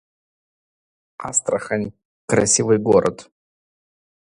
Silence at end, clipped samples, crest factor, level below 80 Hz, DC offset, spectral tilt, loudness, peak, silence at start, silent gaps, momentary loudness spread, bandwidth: 1.1 s; under 0.1%; 20 dB; -54 dBFS; under 0.1%; -4 dB/octave; -19 LUFS; -2 dBFS; 1.2 s; 2.05-2.28 s; 16 LU; 11 kHz